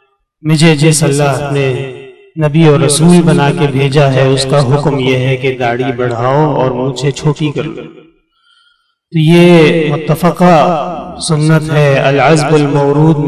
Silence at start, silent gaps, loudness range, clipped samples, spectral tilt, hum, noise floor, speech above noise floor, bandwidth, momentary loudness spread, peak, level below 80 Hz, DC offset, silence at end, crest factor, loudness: 0.45 s; none; 5 LU; under 0.1%; -6 dB/octave; none; -55 dBFS; 46 dB; 13.5 kHz; 10 LU; 0 dBFS; -42 dBFS; under 0.1%; 0 s; 10 dB; -10 LUFS